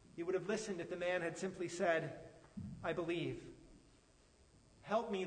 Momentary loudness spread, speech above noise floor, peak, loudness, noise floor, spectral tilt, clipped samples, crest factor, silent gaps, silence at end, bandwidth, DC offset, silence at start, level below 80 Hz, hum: 18 LU; 28 dB; -22 dBFS; -41 LUFS; -68 dBFS; -5 dB/octave; under 0.1%; 20 dB; none; 0 s; 9.6 kHz; under 0.1%; 0.15 s; -70 dBFS; none